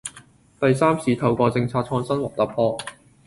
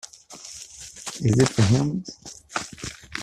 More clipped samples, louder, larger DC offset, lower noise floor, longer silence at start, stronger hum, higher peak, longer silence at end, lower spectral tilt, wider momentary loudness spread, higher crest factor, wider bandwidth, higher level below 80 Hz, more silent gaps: neither; about the same, -22 LUFS vs -24 LUFS; neither; first, -50 dBFS vs -43 dBFS; second, 0.05 s vs 0.3 s; neither; about the same, -6 dBFS vs -4 dBFS; first, 0.35 s vs 0 s; about the same, -6.5 dB/octave vs -5.5 dB/octave; second, 9 LU vs 20 LU; about the same, 18 dB vs 20 dB; second, 11.5 kHz vs 13.5 kHz; about the same, -54 dBFS vs -52 dBFS; neither